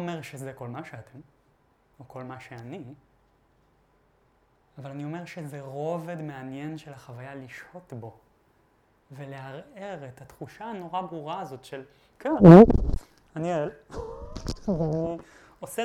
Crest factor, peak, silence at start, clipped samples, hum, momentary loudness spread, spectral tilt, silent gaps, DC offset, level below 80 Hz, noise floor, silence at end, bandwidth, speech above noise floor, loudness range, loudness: 26 dB; 0 dBFS; 0 s; under 0.1%; none; 16 LU; -8.5 dB/octave; none; under 0.1%; -42 dBFS; -65 dBFS; 0 s; 12.5 kHz; 41 dB; 23 LU; -21 LUFS